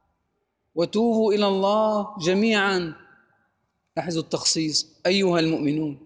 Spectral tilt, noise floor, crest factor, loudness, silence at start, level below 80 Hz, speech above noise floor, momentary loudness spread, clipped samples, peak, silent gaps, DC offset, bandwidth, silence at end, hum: -4 dB/octave; -75 dBFS; 16 dB; -22 LUFS; 0.75 s; -64 dBFS; 52 dB; 8 LU; under 0.1%; -8 dBFS; none; under 0.1%; 10 kHz; 0.1 s; none